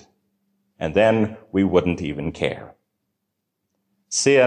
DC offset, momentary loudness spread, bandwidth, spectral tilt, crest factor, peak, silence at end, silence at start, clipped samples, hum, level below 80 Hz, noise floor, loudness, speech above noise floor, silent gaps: under 0.1%; 10 LU; 10.5 kHz; -4.5 dB/octave; 18 dB; -4 dBFS; 0 s; 0.8 s; under 0.1%; none; -46 dBFS; -78 dBFS; -21 LUFS; 58 dB; none